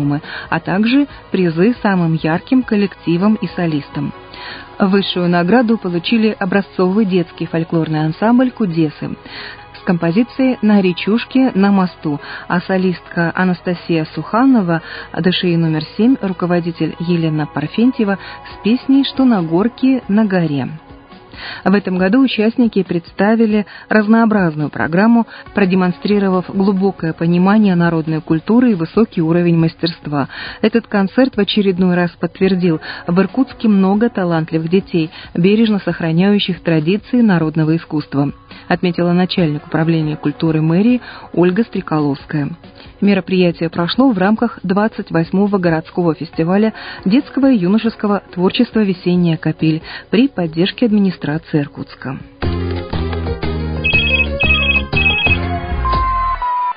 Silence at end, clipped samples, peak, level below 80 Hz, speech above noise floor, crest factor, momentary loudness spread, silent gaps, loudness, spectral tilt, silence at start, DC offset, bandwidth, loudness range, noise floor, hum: 0 s; under 0.1%; 0 dBFS; -34 dBFS; 24 dB; 14 dB; 9 LU; none; -15 LUFS; -11.5 dB/octave; 0 s; under 0.1%; 5.2 kHz; 3 LU; -38 dBFS; none